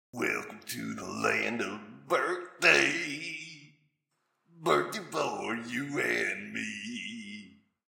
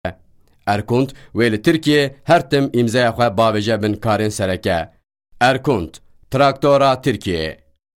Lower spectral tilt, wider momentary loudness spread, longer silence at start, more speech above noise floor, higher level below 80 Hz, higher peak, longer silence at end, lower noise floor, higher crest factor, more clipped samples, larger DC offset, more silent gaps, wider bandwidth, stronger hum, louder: second, -3 dB/octave vs -6 dB/octave; first, 15 LU vs 9 LU; about the same, 0.15 s vs 0.05 s; first, 50 dB vs 35 dB; second, -78 dBFS vs -46 dBFS; second, -8 dBFS vs -4 dBFS; about the same, 0.4 s vs 0.45 s; first, -80 dBFS vs -51 dBFS; first, 24 dB vs 14 dB; neither; neither; neither; about the same, 17 kHz vs 16.5 kHz; neither; second, -30 LUFS vs -17 LUFS